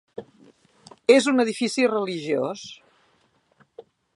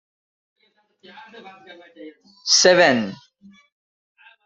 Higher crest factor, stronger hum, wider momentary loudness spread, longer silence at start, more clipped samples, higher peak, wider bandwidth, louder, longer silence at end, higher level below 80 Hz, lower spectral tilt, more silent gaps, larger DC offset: about the same, 22 dB vs 22 dB; neither; first, 23 LU vs 19 LU; second, 0.2 s vs 1.35 s; neither; about the same, -2 dBFS vs -2 dBFS; first, 11.5 kHz vs 8.2 kHz; second, -22 LUFS vs -15 LUFS; second, 0.35 s vs 1.3 s; second, -76 dBFS vs -68 dBFS; first, -4 dB/octave vs -2 dB/octave; neither; neither